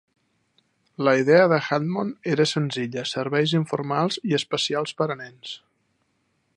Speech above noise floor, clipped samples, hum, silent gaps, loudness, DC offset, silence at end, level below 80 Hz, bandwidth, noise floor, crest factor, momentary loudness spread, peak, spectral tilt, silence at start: 48 dB; under 0.1%; none; none; -23 LUFS; under 0.1%; 1 s; -72 dBFS; 11 kHz; -70 dBFS; 20 dB; 12 LU; -4 dBFS; -5.5 dB/octave; 1 s